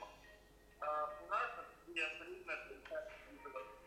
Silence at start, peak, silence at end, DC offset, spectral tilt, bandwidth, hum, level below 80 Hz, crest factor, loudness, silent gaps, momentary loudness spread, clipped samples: 0 s; -28 dBFS; 0 s; under 0.1%; -3 dB/octave; 16 kHz; none; -70 dBFS; 18 dB; -44 LUFS; none; 15 LU; under 0.1%